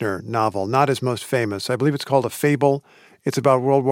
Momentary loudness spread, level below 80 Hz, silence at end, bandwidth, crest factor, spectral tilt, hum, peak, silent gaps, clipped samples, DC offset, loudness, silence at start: 6 LU; -66 dBFS; 0 s; 17 kHz; 18 dB; -6 dB/octave; none; -2 dBFS; none; under 0.1%; under 0.1%; -21 LUFS; 0 s